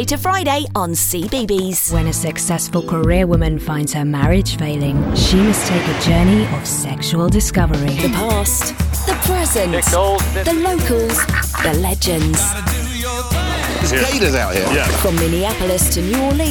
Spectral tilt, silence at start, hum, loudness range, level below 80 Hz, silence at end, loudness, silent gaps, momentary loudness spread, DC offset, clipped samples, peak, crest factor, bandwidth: -4.5 dB/octave; 0 s; none; 1 LU; -24 dBFS; 0 s; -16 LUFS; none; 5 LU; under 0.1%; under 0.1%; -2 dBFS; 14 dB; 19.5 kHz